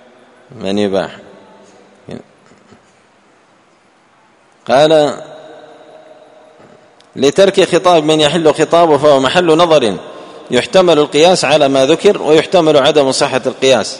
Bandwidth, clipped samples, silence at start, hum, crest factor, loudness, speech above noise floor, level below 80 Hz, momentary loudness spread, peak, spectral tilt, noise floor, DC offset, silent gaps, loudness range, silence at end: 11 kHz; 0.3%; 0.55 s; none; 12 dB; -10 LUFS; 40 dB; -52 dBFS; 19 LU; 0 dBFS; -4 dB/octave; -50 dBFS; under 0.1%; none; 12 LU; 0 s